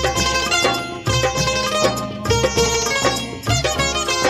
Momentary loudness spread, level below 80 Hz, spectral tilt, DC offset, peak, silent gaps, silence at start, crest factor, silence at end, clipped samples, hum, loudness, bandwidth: 4 LU; -34 dBFS; -3 dB/octave; under 0.1%; -2 dBFS; none; 0 s; 16 dB; 0 s; under 0.1%; none; -18 LUFS; 15.5 kHz